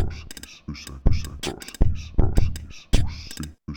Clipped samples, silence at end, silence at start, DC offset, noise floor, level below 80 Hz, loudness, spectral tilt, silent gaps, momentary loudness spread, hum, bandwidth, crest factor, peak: under 0.1%; 0 s; 0 s; under 0.1%; -40 dBFS; -26 dBFS; -28 LUFS; -5.5 dB/octave; none; 13 LU; none; 16.5 kHz; 18 dB; -4 dBFS